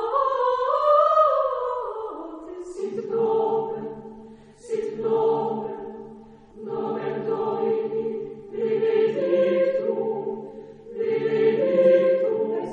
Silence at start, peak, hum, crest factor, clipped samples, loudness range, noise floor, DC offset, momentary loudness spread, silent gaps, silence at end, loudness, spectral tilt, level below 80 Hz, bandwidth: 0 s; -8 dBFS; none; 16 dB; under 0.1%; 6 LU; -45 dBFS; under 0.1%; 18 LU; none; 0 s; -23 LUFS; -7 dB/octave; -62 dBFS; 8.6 kHz